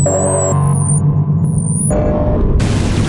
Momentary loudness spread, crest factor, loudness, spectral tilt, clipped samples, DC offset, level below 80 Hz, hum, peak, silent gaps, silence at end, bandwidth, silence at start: 2 LU; 8 dB; -14 LUFS; -6 dB/octave; under 0.1%; under 0.1%; -22 dBFS; none; -4 dBFS; none; 0 s; 11 kHz; 0 s